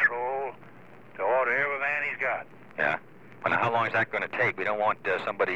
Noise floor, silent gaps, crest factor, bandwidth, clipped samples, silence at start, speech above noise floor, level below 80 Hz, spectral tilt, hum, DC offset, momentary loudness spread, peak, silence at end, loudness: -51 dBFS; none; 16 dB; 9.4 kHz; under 0.1%; 0 s; 24 dB; -74 dBFS; -6 dB/octave; none; 0.3%; 9 LU; -12 dBFS; 0 s; -27 LUFS